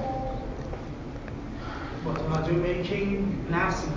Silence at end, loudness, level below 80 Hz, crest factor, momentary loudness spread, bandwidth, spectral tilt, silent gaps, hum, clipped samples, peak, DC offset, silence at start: 0 s; -30 LUFS; -40 dBFS; 16 dB; 11 LU; 7.6 kHz; -7 dB/octave; none; none; under 0.1%; -14 dBFS; under 0.1%; 0 s